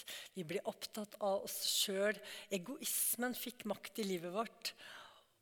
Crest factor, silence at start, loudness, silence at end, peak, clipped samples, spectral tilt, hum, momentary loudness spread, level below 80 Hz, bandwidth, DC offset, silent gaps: 18 dB; 0 s; -39 LUFS; 0.2 s; -22 dBFS; under 0.1%; -2 dB/octave; none; 12 LU; -86 dBFS; 19 kHz; under 0.1%; none